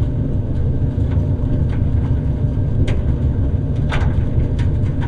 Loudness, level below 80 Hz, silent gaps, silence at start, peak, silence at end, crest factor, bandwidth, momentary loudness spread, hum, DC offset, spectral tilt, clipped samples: -19 LUFS; -20 dBFS; none; 0 s; -4 dBFS; 0 s; 12 dB; 7.2 kHz; 1 LU; none; under 0.1%; -9 dB/octave; under 0.1%